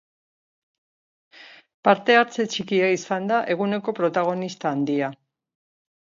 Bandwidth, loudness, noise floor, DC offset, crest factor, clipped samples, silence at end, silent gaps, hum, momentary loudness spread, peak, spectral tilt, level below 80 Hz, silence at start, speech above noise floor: 7.6 kHz; -22 LUFS; under -90 dBFS; under 0.1%; 20 dB; under 0.1%; 1 s; 1.74-1.83 s; none; 8 LU; -4 dBFS; -5 dB/octave; -74 dBFS; 1.4 s; over 68 dB